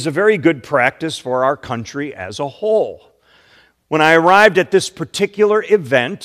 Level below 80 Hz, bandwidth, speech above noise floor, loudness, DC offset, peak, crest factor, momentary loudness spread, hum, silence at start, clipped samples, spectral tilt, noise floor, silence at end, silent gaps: -58 dBFS; 14.5 kHz; 37 dB; -15 LUFS; under 0.1%; 0 dBFS; 16 dB; 15 LU; none; 0 s; 0.2%; -4.5 dB/octave; -52 dBFS; 0 s; none